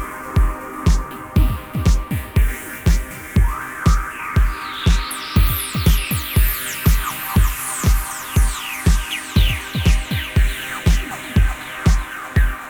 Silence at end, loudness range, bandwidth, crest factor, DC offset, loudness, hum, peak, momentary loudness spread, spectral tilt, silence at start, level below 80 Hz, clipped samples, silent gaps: 0 s; 2 LU; over 20 kHz; 14 dB; under 0.1%; -20 LUFS; none; -4 dBFS; 4 LU; -4.5 dB/octave; 0 s; -20 dBFS; under 0.1%; none